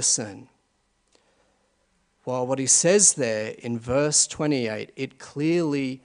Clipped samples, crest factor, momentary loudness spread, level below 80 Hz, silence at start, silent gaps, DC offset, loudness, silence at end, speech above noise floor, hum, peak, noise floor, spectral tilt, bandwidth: under 0.1%; 20 dB; 17 LU; -62 dBFS; 0 s; none; under 0.1%; -22 LUFS; 0.1 s; 46 dB; none; -4 dBFS; -69 dBFS; -3 dB/octave; 11 kHz